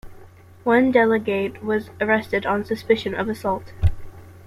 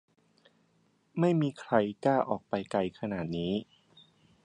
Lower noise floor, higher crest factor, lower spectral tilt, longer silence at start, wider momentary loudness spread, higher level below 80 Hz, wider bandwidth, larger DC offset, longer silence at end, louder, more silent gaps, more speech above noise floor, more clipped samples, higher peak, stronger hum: second, -45 dBFS vs -70 dBFS; about the same, 18 dB vs 22 dB; about the same, -7 dB/octave vs -7.5 dB/octave; second, 0.05 s vs 1.15 s; about the same, 9 LU vs 7 LU; first, -38 dBFS vs -64 dBFS; first, 15 kHz vs 10 kHz; neither; second, 0 s vs 0.8 s; first, -21 LUFS vs -31 LUFS; neither; second, 24 dB vs 40 dB; neither; first, -4 dBFS vs -10 dBFS; neither